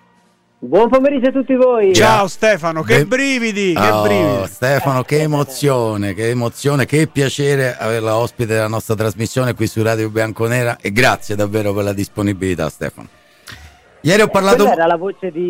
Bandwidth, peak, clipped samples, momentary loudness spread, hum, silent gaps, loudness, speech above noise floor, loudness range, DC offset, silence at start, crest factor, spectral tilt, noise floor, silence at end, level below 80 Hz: 16.5 kHz; -2 dBFS; under 0.1%; 8 LU; none; none; -15 LUFS; 40 dB; 5 LU; under 0.1%; 0.6 s; 14 dB; -5.5 dB/octave; -55 dBFS; 0 s; -44 dBFS